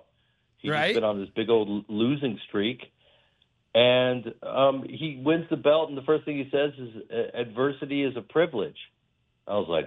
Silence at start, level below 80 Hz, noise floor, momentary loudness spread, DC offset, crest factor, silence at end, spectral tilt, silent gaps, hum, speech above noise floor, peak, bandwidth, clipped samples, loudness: 0.65 s; -68 dBFS; -72 dBFS; 10 LU; under 0.1%; 18 dB; 0 s; -7 dB/octave; none; none; 46 dB; -8 dBFS; 10.5 kHz; under 0.1%; -26 LUFS